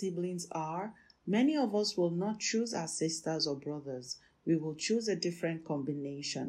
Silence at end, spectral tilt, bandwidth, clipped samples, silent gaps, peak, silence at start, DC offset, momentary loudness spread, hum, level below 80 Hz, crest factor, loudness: 0 s; -4.5 dB/octave; 13 kHz; under 0.1%; none; -20 dBFS; 0 s; under 0.1%; 10 LU; none; -76 dBFS; 16 dB; -34 LUFS